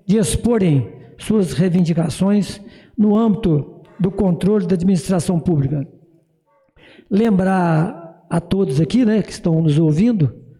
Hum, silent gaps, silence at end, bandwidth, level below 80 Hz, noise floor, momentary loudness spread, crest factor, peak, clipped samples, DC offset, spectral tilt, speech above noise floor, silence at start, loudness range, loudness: none; none; 0.2 s; 13 kHz; -42 dBFS; -60 dBFS; 9 LU; 10 dB; -8 dBFS; under 0.1%; under 0.1%; -7.5 dB/octave; 44 dB; 0.1 s; 3 LU; -17 LUFS